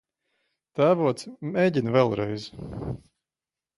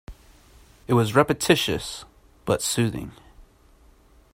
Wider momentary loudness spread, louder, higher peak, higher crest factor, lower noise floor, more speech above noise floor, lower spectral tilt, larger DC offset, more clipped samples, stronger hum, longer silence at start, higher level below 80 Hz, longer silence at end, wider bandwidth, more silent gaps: second, 15 LU vs 18 LU; about the same, -25 LUFS vs -23 LUFS; second, -6 dBFS vs -2 dBFS; about the same, 20 dB vs 24 dB; first, under -90 dBFS vs -55 dBFS; first, over 65 dB vs 33 dB; first, -7 dB/octave vs -4.5 dB/octave; neither; neither; neither; first, 0.75 s vs 0.1 s; about the same, -54 dBFS vs -50 dBFS; about the same, 0.8 s vs 0.9 s; second, 11.5 kHz vs 16 kHz; neither